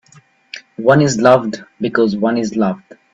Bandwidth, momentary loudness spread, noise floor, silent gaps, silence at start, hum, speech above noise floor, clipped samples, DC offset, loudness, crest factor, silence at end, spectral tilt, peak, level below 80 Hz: 8.2 kHz; 19 LU; -49 dBFS; none; 0.55 s; none; 35 dB; under 0.1%; under 0.1%; -15 LUFS; 16 dB; 0.35 s; -6 dB/octave; 0 dBFS; -54 dBFS